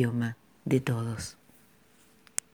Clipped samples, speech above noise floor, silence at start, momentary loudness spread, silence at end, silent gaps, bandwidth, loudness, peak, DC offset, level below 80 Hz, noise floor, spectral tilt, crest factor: under 0.1%; 32 dB; 0 s; 12 LU; 1.2 s; none; over 20 kHz; -32 LUFS; -4 dBFS; under 0.1%; -62 dBFS; -62 dBFS; -5.5 dB/octave; 30 dB